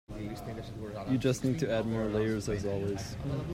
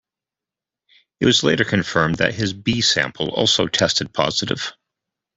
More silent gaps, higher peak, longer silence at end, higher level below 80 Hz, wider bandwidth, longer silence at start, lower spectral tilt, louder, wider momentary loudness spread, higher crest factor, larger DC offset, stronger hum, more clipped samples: neither; second, -16 dBFS vs -2 dBFS; second, 0 s vs 0.65 s; about the same, -50 dBFS vs -50 dBFS; first, 16 kHz vs 8.4 kHz; second, 0.1 s vs 1.2 s; first, -6.5 dB/octave vs -3.5 dB/octave; second, -33 LUFS vs -18 LUFS; first, 11 LU vs 6 LU; about the same, 18 dB vs 20 dB; neither; neither; neither